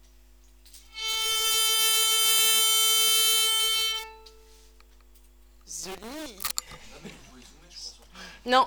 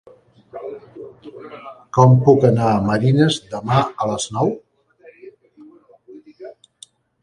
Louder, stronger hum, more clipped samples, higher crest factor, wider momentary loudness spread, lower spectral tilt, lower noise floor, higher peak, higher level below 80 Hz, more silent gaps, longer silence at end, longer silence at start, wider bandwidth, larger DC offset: second, -21 LUFS vs -16 LUFS; neither; neither; about the same, 20 dB vs 20 dB; second, 22 LU vs 26 LU; second, 1.5 dB/octave vs -6.5 dB/octave; first, -55 dBFS vs -49 dBFS; second, -6 dBFS vs 0 dBFS; about the same, -56 dBFS vs -52 dBFS; neither; second, 0 s vs 0.7 s; first, 0.75 s vs 0.55 s; first, over 20 kHz vs 11 kHz; neither